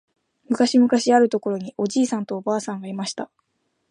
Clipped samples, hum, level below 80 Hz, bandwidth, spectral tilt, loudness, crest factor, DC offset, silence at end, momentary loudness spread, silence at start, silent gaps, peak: under 0.1%; none; -74 dBFS; 10.5 kHz; -4.5 dB/octave; -21 LUFS; 16 dB; under 0.1%; 0.65 s; 13 LU; 0.5 s; none; -6 dBFS